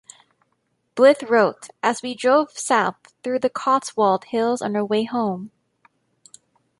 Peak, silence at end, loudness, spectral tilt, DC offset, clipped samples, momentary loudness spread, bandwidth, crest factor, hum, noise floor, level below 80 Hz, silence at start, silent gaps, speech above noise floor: -2 dBFS; 1.3 s; -20 LUFS; -4 dB/octave; under 0.1%; under 0.1%; 10 LU; 11.5 kHz; 20 dB; none; -70 dBFS; -72 dBFS; 0.95 s; none; 50 dB